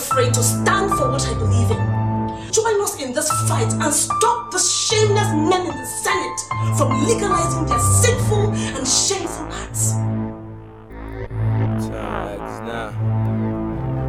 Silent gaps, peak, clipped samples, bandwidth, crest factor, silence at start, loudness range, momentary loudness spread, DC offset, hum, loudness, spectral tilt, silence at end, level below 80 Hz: none; -2 dBFS; under 0.1%; 15.5 kHz; 16 dB; 0 s; 6 LU; 11 LU; under 0.1%; none; -19 LUFS; -4 dB/octave; 0 s; -36 dBFS